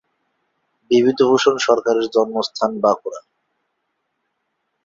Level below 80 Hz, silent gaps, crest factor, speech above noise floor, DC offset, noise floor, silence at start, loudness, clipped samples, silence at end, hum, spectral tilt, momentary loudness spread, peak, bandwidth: -64 dBFS; none; 18 dB; 56 dB; under 0.1%; -73 dBFS; 0.9 s; -17 LUFS; under 0.1%; 1.65 s; none; -4 dB/octave; 8 LU; -2 dBFS; 7.6 kHz